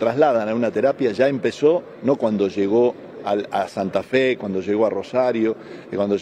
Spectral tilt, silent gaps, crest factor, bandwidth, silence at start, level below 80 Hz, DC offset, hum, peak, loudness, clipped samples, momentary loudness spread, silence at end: -6.5 dB/octave; none; 16 dB; 9.8 kHz; 0 s; -64 dBFS; under 0.1%; none; -4 dBFS; -21 LUFS; under 0.1%; 6 LU; 0 s